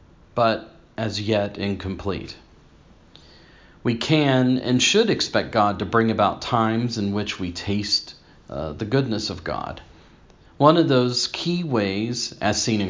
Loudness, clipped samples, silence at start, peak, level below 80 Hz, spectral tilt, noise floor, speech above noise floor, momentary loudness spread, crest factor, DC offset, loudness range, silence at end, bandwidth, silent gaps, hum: -22 LUFS; under 0.1%; 0.35 s; 0 dBFS; -48 dBFS; -5 dB/octave; -51 dBFS; 29 dB; 13 LU; 22 dB; under 0.1%; 7 LU; 0 s; 7.6 kHz; none; none